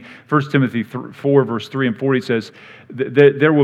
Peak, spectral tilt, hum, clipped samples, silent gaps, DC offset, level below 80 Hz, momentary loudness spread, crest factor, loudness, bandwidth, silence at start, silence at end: 0 dBFS; -8 dB/octave; none; under 0.1%; none; under 0.1%; -72 dBFS; 13 LU; 16 dB; -17 LUFS; 8.4 kHz; 0.05 s; 0 s